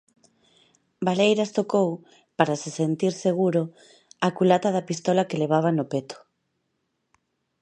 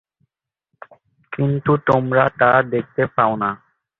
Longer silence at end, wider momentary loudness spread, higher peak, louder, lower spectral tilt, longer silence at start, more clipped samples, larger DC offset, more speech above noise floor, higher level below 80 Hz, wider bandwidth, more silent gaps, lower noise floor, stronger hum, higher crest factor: first, 1.45 s vs 0.45 s; about the same, 10 LU vs 9 LU; about the same, -4 dBFS vs -2 dBFS; second, -24 LUFS vs -18 LUFS; second, -6 dB/octave vs -9 dB/octave; second, 1 s vs 1.3 s; neither; neither; second, 53 dB vs 57 dB; second, -74 dBFS vs -54 dBFS; first, 10 kHz vs 6.2 kHz; neither; about the same, -76 dBFS vs -74 dBFS; neither; about the same, 22 dB vs 18 dB